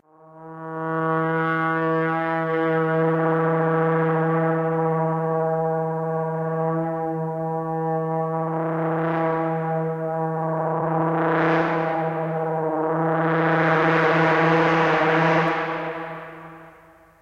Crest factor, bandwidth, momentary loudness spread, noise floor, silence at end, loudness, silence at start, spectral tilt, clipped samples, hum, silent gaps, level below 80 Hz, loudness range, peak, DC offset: 18 dB; 6.8 kHz; 8 LU; -51 dBFS; 0.5 s; -22 LUFS; 0.35 s; -8 dB/octave; under 0.1%; none; none; -64 dBFS; 5 LU; -4 dBFS; under 0.1%